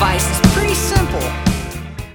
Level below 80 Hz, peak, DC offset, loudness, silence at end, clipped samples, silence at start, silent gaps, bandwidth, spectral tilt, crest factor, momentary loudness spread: -22 dBFS; 0 dBFS; under 0.1%; -16 LUFS; 0 s; under 0.1%; 0 s; none; over 20 kHz; -4.5 dB/octave; 16 dB; 11 LU